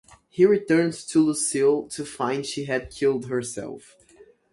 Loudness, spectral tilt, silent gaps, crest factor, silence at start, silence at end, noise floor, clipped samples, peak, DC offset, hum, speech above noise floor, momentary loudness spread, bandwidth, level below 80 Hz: -23 LUFS; -4.5 dB/octave; none; 18 dB; 0.35 s; 0.75 s; -54 dBFS; under 0.1%; -6 dBFS; under 0.1%; none; 31 dB; 14 LU; 11.5 kHz; -58 dBFS